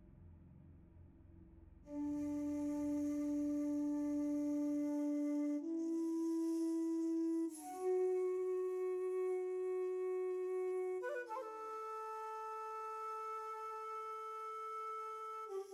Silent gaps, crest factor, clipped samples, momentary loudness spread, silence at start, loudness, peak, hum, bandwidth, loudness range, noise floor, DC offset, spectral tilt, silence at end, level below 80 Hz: none; 10 dB; under 0.1%; 7 LU; 0 s; -41 LUFS; -30 dBFS; none; 14 kHz; 6 LU; -61 dBFS; under 0.1%; -6 dB/octave; 0 s; -72 dBFS